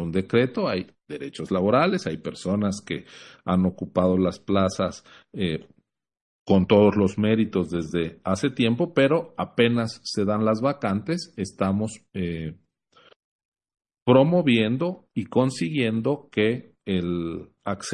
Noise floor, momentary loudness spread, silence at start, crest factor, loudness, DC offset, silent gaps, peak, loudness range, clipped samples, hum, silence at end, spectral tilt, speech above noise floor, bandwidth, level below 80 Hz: -59 dBFS; 13 LU; 0 s; 18 dB; -24 LUFS; under 0.1%; 6.22-6.46 s, 13.16-13.39 s, 13.45-13.52 s, 14.02-14.06 s; -6 dBFS; 4 LU; under 0.1%; none; 0 s; -6.5 dB/octave; 35 dB; 11 kHz; -60 dBFS